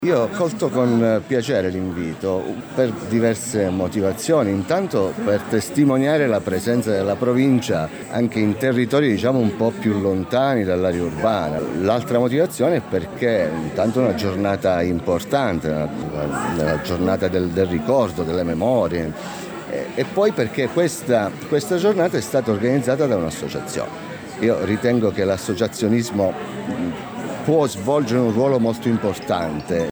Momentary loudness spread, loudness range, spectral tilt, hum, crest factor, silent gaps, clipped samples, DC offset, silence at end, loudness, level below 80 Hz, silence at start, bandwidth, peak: 8 LU; 2 LU; -6 dB/octave; none; 14 dB; none; under 0.1%; under 0.1%; 0 s; -20 LUFS; -52 dBFS; 0 s; over 20 kHz; -6 dBFS